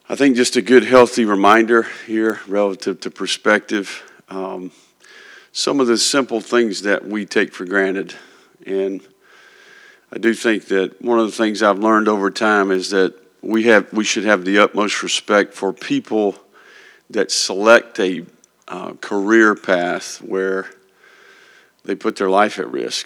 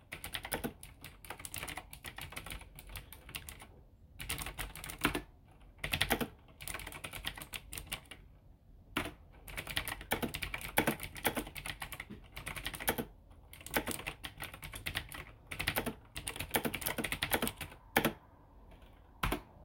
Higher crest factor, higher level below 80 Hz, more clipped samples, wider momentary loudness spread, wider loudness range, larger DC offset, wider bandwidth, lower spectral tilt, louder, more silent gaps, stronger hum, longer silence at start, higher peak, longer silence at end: second, 18 dB vs 30 dB; second, -66 dBFS vs -54 dBFS; neither; about the same, 15 LU vs 15 LU; about the same, 6 LU vs 8 LU; neither; second, 13.5 kHz vs 17 kHz; about the same, -3.5 dB/octave vs -3 dB/octave; first, -17 LUFS vs -39 LUFS; neither; neither; about the same, 0.1 s vs 0 s; first, 0 dBFS vs -10 dBFS; about the same, 0 s vs 0 s